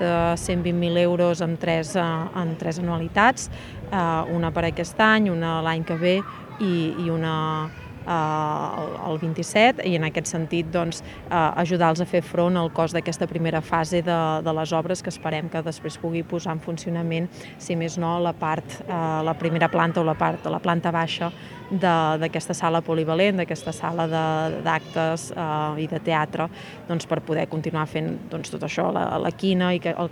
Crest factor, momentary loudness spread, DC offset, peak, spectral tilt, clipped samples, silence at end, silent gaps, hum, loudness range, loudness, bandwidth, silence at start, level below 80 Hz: 20 dB; 9 LU; under 0.1%; -2 dBFS; -5.5 dB/octave; under 0.1%; 0 s; none; none; 4 LU; -24 LUFS; 12.5 kHz; 0 s; -50 dBFS